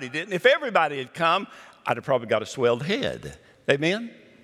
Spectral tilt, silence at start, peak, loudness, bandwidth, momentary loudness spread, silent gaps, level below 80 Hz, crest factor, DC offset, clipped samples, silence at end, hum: -4.5 dB/octave; 0 s; -4 dBFS; -24 LUFS; 14 kHz; 14 LU; none; -62 dBFS; 22 dB; under 0.1%; under 0.1%; 0.3 s; none